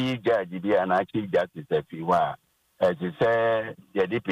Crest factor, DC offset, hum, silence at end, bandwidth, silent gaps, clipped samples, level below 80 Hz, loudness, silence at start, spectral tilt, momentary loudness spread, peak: 14 dB; under 0.1%; none; 0 s; 12.5 kHz; none; under 0.1%; -62 dBFS; -26 LUFS; 0 s; -7 dB/octave; 6 LU; -12 dBFS